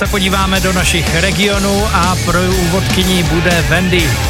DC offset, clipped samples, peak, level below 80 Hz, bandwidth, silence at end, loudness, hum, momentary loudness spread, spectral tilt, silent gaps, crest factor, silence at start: under 0.1%; under 0.1%; 0 dBFS; -22 dBFS; 16.5 kHz; 0 s; -12 LUFS; none; 1 LU; -4 dB/octave; none; 12 dB; 0 s